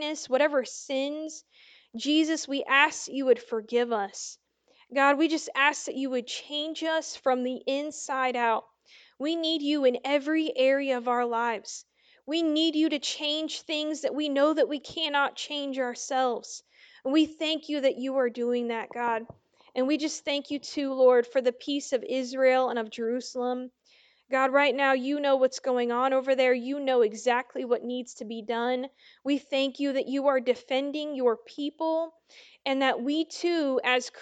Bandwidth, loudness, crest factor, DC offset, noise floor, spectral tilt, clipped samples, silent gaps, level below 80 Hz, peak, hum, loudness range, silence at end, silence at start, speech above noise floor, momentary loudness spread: 9.2 kHz; -27 LUFS; 20 dB; under 0.1%; -63 dBFS; -2 dB/octave; under 0.1%; none; -78 dBFS; -6 dBFS; none; 3 LU; 0 s; 0 s; 35 dB; 9 LU